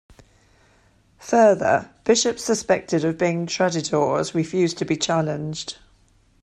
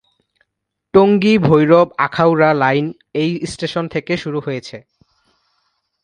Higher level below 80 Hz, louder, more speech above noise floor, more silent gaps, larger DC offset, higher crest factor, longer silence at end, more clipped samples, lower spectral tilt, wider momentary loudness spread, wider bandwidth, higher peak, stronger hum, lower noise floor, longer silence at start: second, -58 dBFS vs -52 dBFS; second, -21 LUFS vs -15 LUFS; second, 37 dB vs 62 dB; neither; neither; about the same, 18 dB vs 16 dB; second, 0.7 s vs 1.25 s; neither; second, -4.5 dB/octave vs -7 dB/octave; about the same, 12 LU vs 12 LU; first, 13.5 kHz vs 10 kHz; second, -4 dBFS vs 0 dBFS; neither; second, -58 dBFS vs -76 dBFS; first, 1.2 s vs 0.95 s